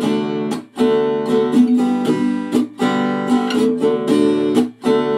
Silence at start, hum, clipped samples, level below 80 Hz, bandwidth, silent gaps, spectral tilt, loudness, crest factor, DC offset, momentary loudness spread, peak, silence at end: 0 s; none; under 0.1%; -64 dBFS; 12.5 kHz; none; -6 dB/octave; -17 LUFS; 14 dB; under 0.1%; 5 LU; -2 dBFS; 0 s